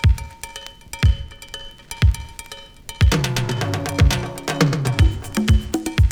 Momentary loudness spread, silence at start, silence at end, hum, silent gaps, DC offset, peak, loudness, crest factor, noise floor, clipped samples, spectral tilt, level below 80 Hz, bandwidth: 17 LU; 0 s; 0 s; none; none; under 0.1%; 0 dBFS; -20 LUFS; 20 dB; -38 dBFS; under 0.1%; -5.5 dB/octave; -24 dBFS; 18.5 kHz